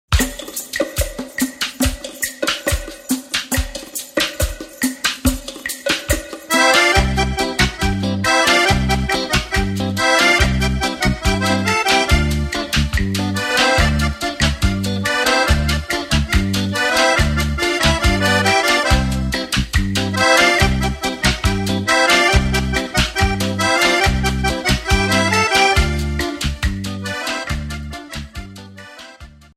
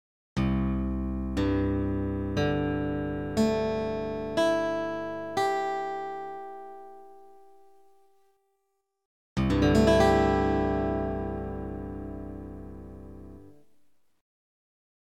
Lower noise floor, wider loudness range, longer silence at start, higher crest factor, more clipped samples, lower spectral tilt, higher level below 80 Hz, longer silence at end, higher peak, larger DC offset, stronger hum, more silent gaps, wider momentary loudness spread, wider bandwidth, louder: second, -40 dBFS vs -79 dBFS; second, 6 LU vs 16 LU; second, 0.1 s vs 0.35 s; about the same, 16 dB vs 20 dB; neither; second, -3.5 dB/octave vs -7 dB/octave; first, -24 dBFS vs -40 dBFS; second, 0.3 s vs 1.6 s; first, 0 dBFS vs -8 dBFS; second, under 0.1% vs 0.3%; neither; second, none vs 9.05-9.36 s; second, 11 LU vs 21 LU; first, 16 kHz vs 14 kHz; first, -17 LUFS vs -28 LUFS